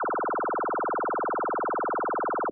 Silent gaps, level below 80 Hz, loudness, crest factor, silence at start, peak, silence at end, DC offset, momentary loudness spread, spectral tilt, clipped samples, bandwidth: none; -68 dBFS; -28 LUFS; 6 dB; 0 s; -22 dBFS; 0 s; under 0.1%; 0 LU; -8 dB/octave; under 0.1%; 2.5 kHz